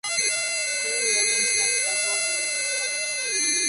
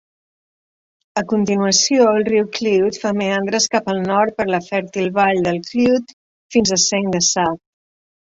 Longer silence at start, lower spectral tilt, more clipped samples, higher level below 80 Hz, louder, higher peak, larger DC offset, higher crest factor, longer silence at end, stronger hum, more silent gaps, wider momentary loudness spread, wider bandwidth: second, 0.05 s vs 1.15 s; second, 2.5 dB/octave vs -3.5 dB/octave; neither; second, -76 dBFS vs -56 dBFS; second, -22 LUFS vs -17 LUFS; second, -10 dBFS vs 0 dBFS; neither; about the same, 16 dB vs 18 dB; second, 0 s vs 0.75 s; neither; second, none vs 6.13-6.50 s; second, 4 LU vs 7 LU; first, 12 kHz vs 8 kHz